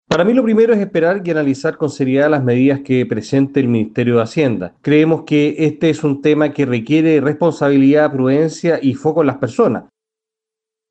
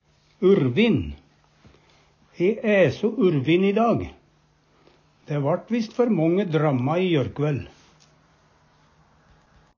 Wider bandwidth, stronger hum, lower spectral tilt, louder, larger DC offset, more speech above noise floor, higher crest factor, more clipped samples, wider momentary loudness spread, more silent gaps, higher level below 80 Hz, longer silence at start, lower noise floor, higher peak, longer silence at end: first, 8.6 kHz vs 7 kHz; neither; about the same, -7.5 dB/octave vs -8 dB/octave; first, -15 LUFS vs -22 LUFS; neither; first, 72 dB vs 40 dB; about the same, 14 dB vs 16 dB; neither; second, 5 LU vs 8 LU; neither; second, -56 dBFS vs -50 dBFS; second, 0.1 s vs 0.4 s; first, -85 dBFS vs -61 dBFS; first, 0 dBFS vs -8 dBFS; second, 1.1 s vs 2.1 s